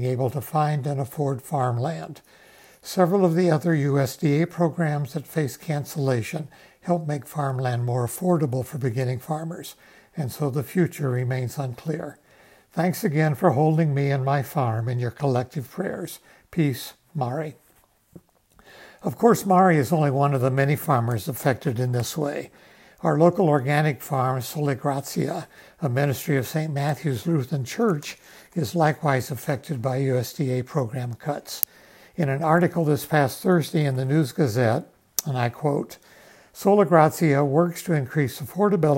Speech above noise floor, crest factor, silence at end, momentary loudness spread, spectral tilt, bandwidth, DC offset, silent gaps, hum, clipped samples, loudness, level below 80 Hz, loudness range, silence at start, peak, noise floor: 37 dB; 24 dB; 0 s; 11 LU; -6.5 dB/octave; 16.5 kHz; under 0.1%; none; none; under 0.1%; -24 LUFS; -66 dBFS; 5 LU; 0 s; 0 dBFS; -60 dBFS